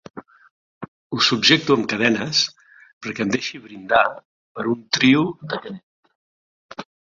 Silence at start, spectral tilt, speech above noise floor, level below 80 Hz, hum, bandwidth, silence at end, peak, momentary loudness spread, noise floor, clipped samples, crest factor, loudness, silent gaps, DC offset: 0.15 s; -3.5 dB/octave; over 70 dB; -62 dBFS; none; 7.6 kHz; 0.3 s; -2 dBFS; 24 LU; under -90 dBFS; under 0.1%; 20 dB; -19 LUFS; 0.51-0.81 s, 0.88-1.10 s, 2.93-3.01 s, 4.25-4.55 s, 5.83-6.03 s, 6.15-6.69 s; under 0.1%